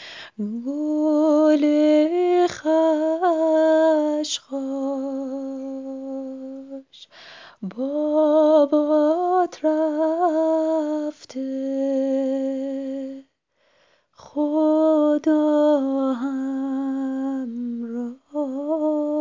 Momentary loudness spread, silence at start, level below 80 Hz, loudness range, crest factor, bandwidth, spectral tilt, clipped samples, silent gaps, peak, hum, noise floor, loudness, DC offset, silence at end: 14 LU; 0 s; -74 dBFS; 8 LU; 16 dB; 7.6 kHz; -5 dB/octave; under 0.1%; none; -6 dBFS; none; -66 dBFS; -21 LUFS; under 0.1%; 0 s